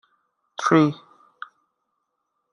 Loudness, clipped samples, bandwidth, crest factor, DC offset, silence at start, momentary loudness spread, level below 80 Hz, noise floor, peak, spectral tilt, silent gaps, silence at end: -20 LUFS; under 0.1%; 10.5 kHz; 24 dB; under 0.1%; 0.6 s; 24 LU; -70 dBFS; -77 dBFS; -2 dBFS; -6.5 dB/octave; none; 1.6 s